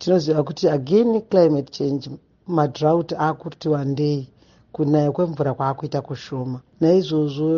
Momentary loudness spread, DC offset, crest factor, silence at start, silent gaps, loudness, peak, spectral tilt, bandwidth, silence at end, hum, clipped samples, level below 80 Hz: 11 LU; under 0.1%; 16 dB; 0 s; none; -21 LUFS; -4 dBFS; -7.5 dB/octave; 7.2 kHz; 0 s; none; under 0.1%; -60 dBFS